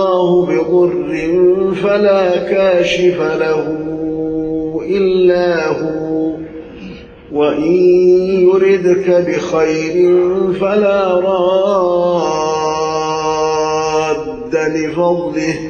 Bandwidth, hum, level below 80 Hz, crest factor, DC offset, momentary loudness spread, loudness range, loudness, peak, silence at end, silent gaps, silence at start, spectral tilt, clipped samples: 7 kHz; none; -44 dBFS; 12 dB; under 0.1%; 8 LU; 4 LU; -13 LUFS; -2 dBFS; 0 s; none; 0 s; -6 dB/octave; under 0.1%